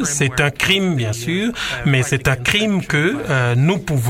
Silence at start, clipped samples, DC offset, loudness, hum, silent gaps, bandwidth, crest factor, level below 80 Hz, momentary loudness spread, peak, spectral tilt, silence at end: 0 s; under 0.1%; under 0.1%; -17 LUFS; none; none; 16.5 kHz; 18 dB; -40 dBFS; 5 LU; 0 dBFS; -4.5 dB/octave; 0 s